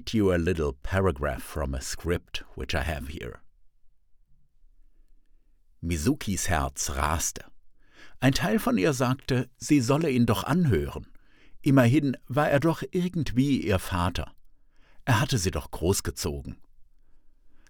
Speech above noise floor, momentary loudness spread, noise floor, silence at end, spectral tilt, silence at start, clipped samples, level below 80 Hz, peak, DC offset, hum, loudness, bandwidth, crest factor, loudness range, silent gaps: 32 dB; 13 LU; -58 dBFS; 0.15 s; -5.5 dB/octave; 0 s; under 0.1%; -42 dBFS; -8 dBFS; under 0.1%; none; -27 LUFS; over 20 kHz; 20 dB; 10 LU; none